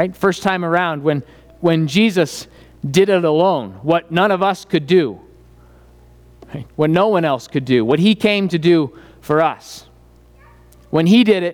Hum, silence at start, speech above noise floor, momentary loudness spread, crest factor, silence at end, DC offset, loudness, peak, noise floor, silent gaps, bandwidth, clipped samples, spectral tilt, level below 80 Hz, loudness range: none; 0 s; 31 dB; 12 LU; 14 dB; 0 s; under 0.1%; -16 LUFS; -2 dBFS; -47 dBFS; none; 17.5 kHz; under 0.1%; -6 dB/octave; -50 dBFS; 3 LU